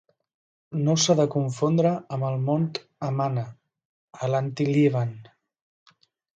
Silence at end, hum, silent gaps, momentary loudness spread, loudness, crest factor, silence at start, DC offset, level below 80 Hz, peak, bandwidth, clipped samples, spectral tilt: 1.15 s; none; 3.85-4.08 s; 11 LU; -25 LUFS; 18 dB; 0.7 s; under 0.1%; -68 dBFS; -8 dBFS; 9 kHz; under 0.1%; -6 dB/octave